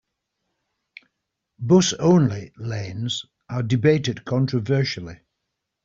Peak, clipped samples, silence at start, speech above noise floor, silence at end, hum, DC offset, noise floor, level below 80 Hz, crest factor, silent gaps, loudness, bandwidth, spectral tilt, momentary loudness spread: -4 dBFS; under 0.1%; 1.6 s; 59 dB; 0.7 s; none; under 0.1%; -80 dBFS; -58 dBFS; 18 dB; none; -21 LUFS; 7.8 kHz; -6 dB/octave; 14 LU